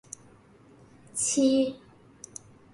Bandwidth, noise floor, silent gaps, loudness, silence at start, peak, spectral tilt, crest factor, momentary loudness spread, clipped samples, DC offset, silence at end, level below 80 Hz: 11.5 kHz; -56 dBFS; none; -26 LUFS; 1.15 s; -12 dBFS; -3 dB/octave; 18 dB; 24 LU; under 0.1%; under 0.1%; 0.95 s; -66 dBFS